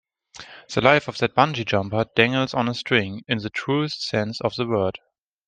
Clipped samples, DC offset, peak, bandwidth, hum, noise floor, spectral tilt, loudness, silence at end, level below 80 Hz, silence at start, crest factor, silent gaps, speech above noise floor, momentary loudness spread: under 0.1%; under 0.1%; 0 dBFS; 9.6 kHz; none; -45 dBFS; -5.5 dB/octave; -22 LUFS; 0.5 s; -58 dBFS; 0.35 s; 22 dB; none; 23 dB; 9 LU